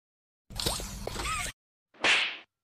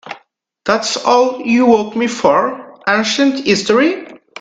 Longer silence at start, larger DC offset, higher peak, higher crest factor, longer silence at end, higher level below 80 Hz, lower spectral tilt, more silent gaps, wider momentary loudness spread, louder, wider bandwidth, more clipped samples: first, 0.5 s vs 0.05 s; neither; second, -12 dBFS vs 0 dBFS; first, 22 dB vs 14 dB; about the same, 0.2 s vs 0.25 s; first, -46 dBFS vs -56 dBFS; second, -1.5 dB/octave vs -3.5 dB/octave; first, 1.53-1.86 s vs none; about the same, 14 LU vs 13 LU; second, -29 LUFS vs -14 LUFS; first, 15.5 kHz vs 9.2 kHz; neither